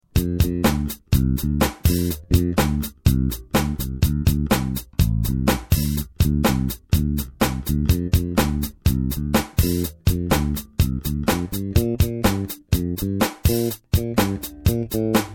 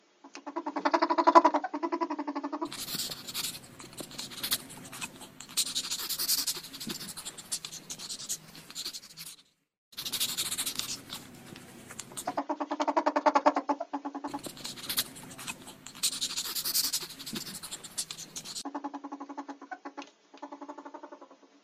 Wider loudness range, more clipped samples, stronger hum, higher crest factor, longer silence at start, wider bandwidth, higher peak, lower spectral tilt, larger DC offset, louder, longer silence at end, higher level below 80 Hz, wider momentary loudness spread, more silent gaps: second, 1 LU vs 10 LU; neither; neither; second, 18 dB vs 32 dB; about the same, 0.15 s vs 0.25 s; first, 17.5 kHz vs 15.5 kHz; about the same, -4 dBFS vs -2 dBFS; first, -6 dB/octave vs -1.5 dB/octave; neither; first, -22 LUFS vs -32 LUFS; second, 0 s vs 0.3 s; first, -28 dBFS vs -70 dBFS; second, 4 LU vs 18 LU; second, none vs 9.78-9.91 s